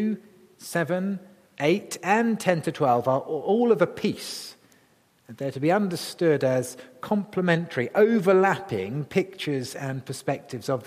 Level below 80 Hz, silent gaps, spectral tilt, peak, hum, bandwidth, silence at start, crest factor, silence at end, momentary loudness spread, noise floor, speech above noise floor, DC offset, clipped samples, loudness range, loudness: -70 dBFS; none; -6 dB/octave; -6 dBFS; none; 15.5 kHz; 0 s; 20 dB; 0 s; 12 LU; -62 dBFS; 37 dB; under 0.1%; under 0.1%; 3 LU; -25 LUFS